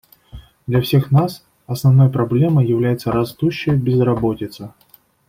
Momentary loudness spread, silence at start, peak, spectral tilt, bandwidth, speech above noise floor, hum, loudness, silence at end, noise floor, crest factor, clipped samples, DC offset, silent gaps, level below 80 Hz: 16 LU; 0.35 s; -4 dBFS; -8 dB/octave; 16 kHz; 24 dB; none; -17 LUFS; 0.6 s; -40 dBFS; 14 dB; under 0.1%; under 0.1%; none; -46 dBFS